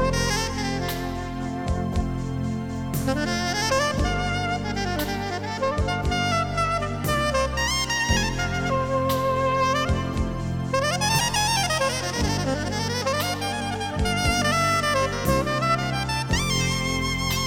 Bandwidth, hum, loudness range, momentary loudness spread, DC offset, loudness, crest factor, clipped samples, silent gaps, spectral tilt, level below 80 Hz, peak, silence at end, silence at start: 19.5 kHz; none; 3 LU; 7 LU; under 0.1%; -24 LUFS; 16 dB; under 0.1%; none; -4 dB/octave; -34 dBFS; -8 dBFS; 0 s; 0 s